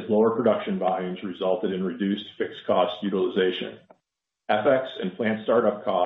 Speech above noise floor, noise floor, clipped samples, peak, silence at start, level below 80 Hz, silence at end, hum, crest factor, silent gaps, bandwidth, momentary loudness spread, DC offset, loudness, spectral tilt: 58 dB; -82 dBFS; under 0.1%; -8 dBFS; 0 s; -70 dBFS; 0 s; none; 18 dB; none; 4.7 kHz; 10 LU; under 0.1%; -25 LUFS; -9 dB/octave